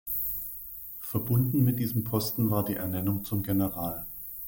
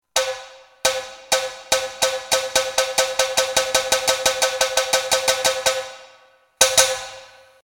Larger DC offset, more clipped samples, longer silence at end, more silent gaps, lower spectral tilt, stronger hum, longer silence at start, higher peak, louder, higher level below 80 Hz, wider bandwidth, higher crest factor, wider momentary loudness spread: neither; neither; second, 0 s vs 0.35 s; neither; first, -7 dB/octave vs 1 dB/octave; neither; about the same, 0.05 s vs 0.15 s; second, -12 dBFS vs 0 dBFS; second, -29 LUFS vs -19 LUFS; about the same, -54 dBFS vs -54 dBFS; about the same, 17 kHz vs 17.5 kHz; second, 16 dB vs 22 dB; first, 11 LU vs 8 LU